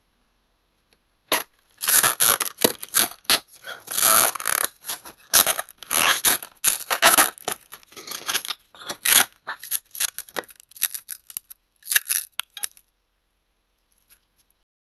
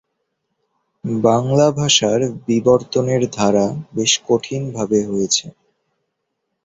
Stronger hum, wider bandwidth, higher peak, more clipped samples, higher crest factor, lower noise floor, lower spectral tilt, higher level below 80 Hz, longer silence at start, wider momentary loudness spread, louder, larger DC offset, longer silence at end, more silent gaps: neither; first, 16 kHz vs 8.4 kHz; about the same, 0 dBFS vs 0 dBFS; neither; first, 26 dB vs 18 dB; second, -71 dBFS vs -75 dBFS; second, 1 dB/octave vs -4 dB/octave; second, -62 dBFS vs -54 dBFS; first, 1.3 s vs 1.05 s; first, 18 LU vs 7 LU; second, -20 LUFS vs -17 LUFS; neither; first, 2.3 s vs 1.15 s; neither